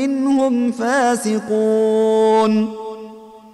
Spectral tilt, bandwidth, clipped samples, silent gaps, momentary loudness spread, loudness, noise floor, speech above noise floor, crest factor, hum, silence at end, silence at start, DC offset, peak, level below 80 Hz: -5 dB/octave; 12 kHz; under 0.1%; none; 16 LU; -17 LUFS; -38 dBFS; 22 dB; 12 dB; none; 0.05 s; 0 s; under 0.1%; -6 dBFS; -64 dBFS